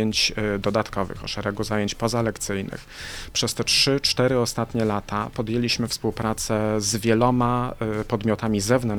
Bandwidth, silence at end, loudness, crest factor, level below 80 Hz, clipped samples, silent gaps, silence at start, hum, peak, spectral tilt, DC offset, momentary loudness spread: 19.5 kHz; 0 s; -23 LUFS; 18 dB; -42 dBFS; under 0.1%; none; 0 s; none; -6 dBFS; -4 dB/octave; under 0.1%; 9 LU